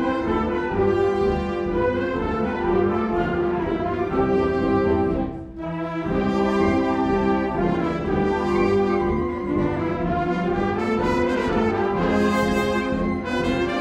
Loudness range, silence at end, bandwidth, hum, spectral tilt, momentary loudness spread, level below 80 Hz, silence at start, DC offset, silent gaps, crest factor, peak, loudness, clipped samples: 1 LU; 0 s; 12.5 kHz; none; -7.5 dB/octave; 4 LU; -38 dBFS; 0 s; under 0.1%; none; 14 dB; -8 dBFS; -22 LUFS; under 0.1%